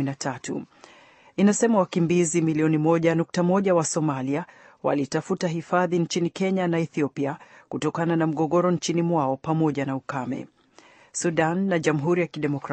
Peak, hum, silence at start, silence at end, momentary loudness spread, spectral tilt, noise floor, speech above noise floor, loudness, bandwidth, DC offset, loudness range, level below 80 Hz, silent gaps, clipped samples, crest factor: -8 dBFS; none; 0 s; 0 s; 9 LU; -6 dB/octave; -54 dBFS; 31 dB; -24 LUFS; 8.8 kHz; under 0.1%; 4 LU; -66 dBFS; none; under 0.1%; 16 dB